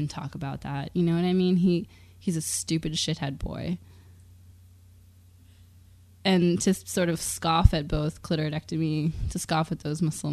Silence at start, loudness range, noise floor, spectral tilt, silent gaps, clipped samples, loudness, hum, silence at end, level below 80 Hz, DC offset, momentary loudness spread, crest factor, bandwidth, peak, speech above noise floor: 0 s; 8 LU; -54 dBFS; -5.5 dB/octave; none; under 0.1%; -27 LUFS; none; 0 s; -38 dBFS; under 0.1%; 11 LU; 26 dB; 14 kHz; -2 dBFS; 28 dB